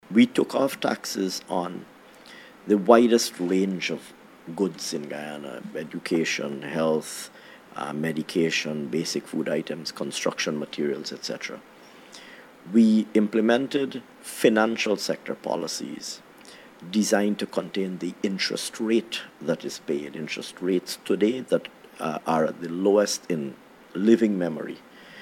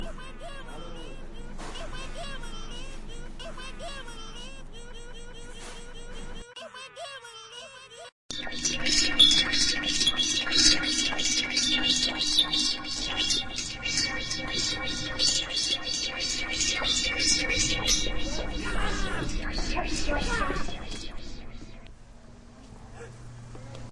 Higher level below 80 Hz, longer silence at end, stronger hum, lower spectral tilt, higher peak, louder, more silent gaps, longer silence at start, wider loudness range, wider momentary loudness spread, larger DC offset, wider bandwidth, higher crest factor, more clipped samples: second, -72 dBFS vs -38 dBFS; about the same, 0 s vs 0 s; neither; first, -4.5 dB/octave vs -1 dB/octave; first, -2 dBFS vs -6 dBFS; about the same, -25 LUFS vs -25 LUFS; second, none vs 8.12-8.29 s; about the same, 0.1 s vs 0 s; second, 5 LU vs 20 LU; second, 17 LU vs 22 LU; neither; first, 16 kHz vs 12 kHz; about the same, 24 dB vs 22 dB; neither